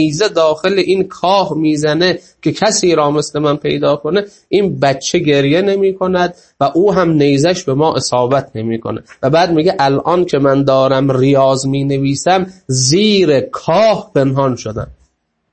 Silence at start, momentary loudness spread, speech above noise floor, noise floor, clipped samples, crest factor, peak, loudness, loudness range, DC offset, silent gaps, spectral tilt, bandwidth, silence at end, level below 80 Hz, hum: 0 s; 7 LU; 46 dB; -58 dBFS; under 0.1%; 12 dB; 0 dBFS; -13 LUFS; 2 LU; under 0.1%; none; -5 dB/octave; 8.8 kHz; 0.6 s; -46 dBFS; none